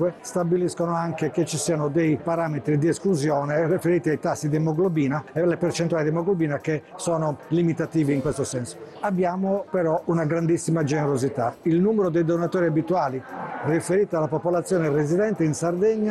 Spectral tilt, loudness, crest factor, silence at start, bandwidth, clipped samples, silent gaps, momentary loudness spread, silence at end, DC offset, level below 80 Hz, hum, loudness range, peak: -6.5 dB/octave; -24 LUFS; 10 dB; 0 s; 12.5 kHz; under 0.1%; none; 4 LU; 0 s; under 0.1%; -58 dBFS; none; 2 LU; -12 dBFS